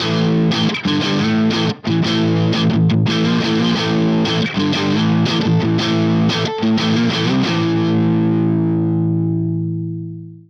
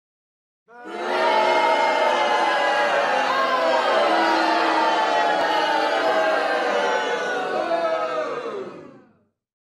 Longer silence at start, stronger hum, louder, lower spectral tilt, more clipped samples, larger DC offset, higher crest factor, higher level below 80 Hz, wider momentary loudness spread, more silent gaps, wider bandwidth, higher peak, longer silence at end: second, 0 s vs 0.75 s; neither; first, -16 LUFS vs -20 LUFS; first, -6.5 dB/octave vs -2.5 dB/octave; neither; neither; about the same, 10 dB vs 14 dB; first, -52 dBFS vs -72 dBFS; second, 3 LU vs 7 LU; neither; second, 7.2 kHz vs 12.5 kHz; about the same, -6 dBFS vs -8 dBFS; second, 0.1 s vs 0.8 s